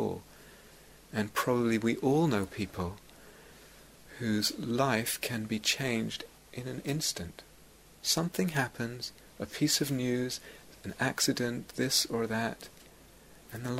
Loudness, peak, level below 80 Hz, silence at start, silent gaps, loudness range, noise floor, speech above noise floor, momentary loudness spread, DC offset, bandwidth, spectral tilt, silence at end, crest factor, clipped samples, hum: -31 LUFS; -14 dBFS; -60 dBFS; 0 s; none; 3 LU; -57 dBFS; 25 dB; 16 LU; under 0.1%; 16 kHz; -4 dB/octave; 0 s; 20 dB; under 0.1%; none